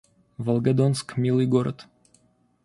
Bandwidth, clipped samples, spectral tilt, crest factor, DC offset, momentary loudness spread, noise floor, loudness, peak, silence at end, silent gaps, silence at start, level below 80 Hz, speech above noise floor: 11.5 kHz; under 0.1%; -7.5 dB/octave; 16 dB; under 0.1%; 11 LU; -62 dBFS; -24 LUFS; -8 dBFS; 0.8 s; none; 0.4 s; -60 dBFS; 40 dB